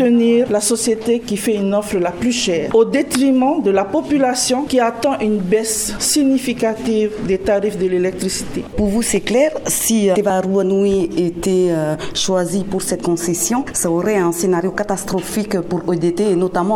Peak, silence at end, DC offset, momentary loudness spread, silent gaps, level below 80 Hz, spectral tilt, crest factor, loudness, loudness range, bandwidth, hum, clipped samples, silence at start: -2 dBFS; 0 s; under 0.1%; 6 LU; none; -42 dBFS; -4.5 dB/octave; 16 dB; -17 LUFS; 2 LU; 17.5 kHz; none; under 0.1%; 0 s